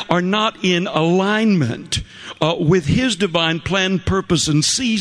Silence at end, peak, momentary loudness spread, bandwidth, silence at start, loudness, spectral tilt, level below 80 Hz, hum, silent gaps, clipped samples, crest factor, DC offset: 0 s; -2 dBFS; 5 LU; 11 kHz; 0 s; -17 LUFS; -4.5 dB/octave; -40 dBFS; none; none; under 0.1%; 16 dB; under 0.1%